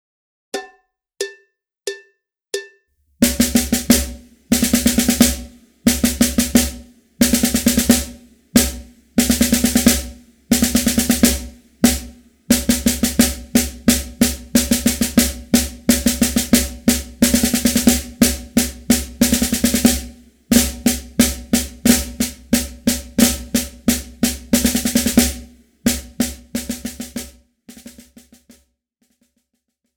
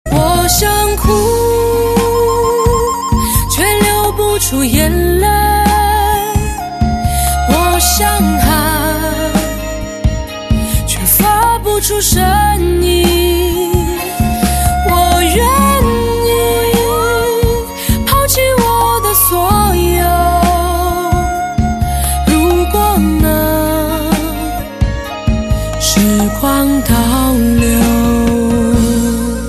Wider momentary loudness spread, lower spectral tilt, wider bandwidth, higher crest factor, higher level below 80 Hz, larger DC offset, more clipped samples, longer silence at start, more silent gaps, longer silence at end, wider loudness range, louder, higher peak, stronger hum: first, 14 LU vs 6 LU; second, -3 dB/octave vs -4.5 dB/octave; first, over 20 kHz vs 14.5 kHz; first, 18 dB vs 12 dB; second, -32 dBFS vs -18 dBFS; neither; neither; first, 0.55 s vs 0.05 s; neither; first, 2.05 s vs 0 s; first, 6 LU vs 2 LU; second, -17 LUFS vs -12 LUFS; about the same, 0 dBFS vs 0 dBFS; neither